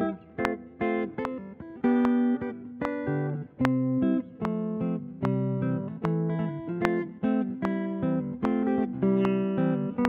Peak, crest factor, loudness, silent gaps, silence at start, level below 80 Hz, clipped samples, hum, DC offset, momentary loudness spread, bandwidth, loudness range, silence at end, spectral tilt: -2 dBFS; 26 dB; -28 LUFS; none; 0 s; -58 dBFS; under 0.1%; none; under 0.1%; 7 LU; 6.6 kHz; 2 LU; 0 s; -9 dB/octave